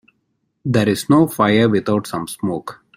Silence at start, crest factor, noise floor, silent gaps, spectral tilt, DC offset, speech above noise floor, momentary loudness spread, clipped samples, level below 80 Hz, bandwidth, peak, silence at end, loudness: 0.65 s; 16 dB; -69 dBFS; none; -6 dB/octave; under 0.1%; 53 dB; 12 LU; under 0.1%; -54 dBFS; 16 kHz; -2 dBFS; 0.25 s; -17 LUFS